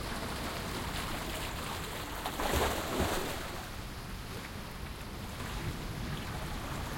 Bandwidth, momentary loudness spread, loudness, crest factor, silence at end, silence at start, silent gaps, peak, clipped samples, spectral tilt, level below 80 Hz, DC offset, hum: 17 kHz; 10 LU; -37 LUFS; 20 dB; 0 s; 0 s; none; -18 dBFS; under 0.1%; -4 dB/octave; -44 dBFS; under 0.1%; none